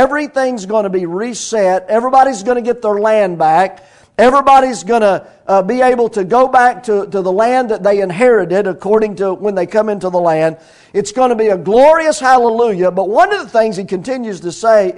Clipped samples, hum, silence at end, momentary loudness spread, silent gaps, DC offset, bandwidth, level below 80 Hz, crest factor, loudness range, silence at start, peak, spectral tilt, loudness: 0.6%; none; 0 s; 9 LU; none; under 0.1%; 12 kHz; -48 dBFS; 12 dB; 2 LU; 0 s; 0 dBFS; -5 dB/octave; -13 LUFS